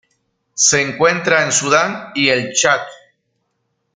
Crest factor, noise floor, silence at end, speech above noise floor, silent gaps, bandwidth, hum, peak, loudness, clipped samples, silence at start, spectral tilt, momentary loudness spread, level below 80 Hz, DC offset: 16 dB; -70 dBFS; 1 s; 54 dB; none; 10.5 kHz; none; 0 dBFS; -14 LUFS; under 0.1%; 0.55 s; -2 dB/octave; 7 LU; -58 dBFS; under 0.1%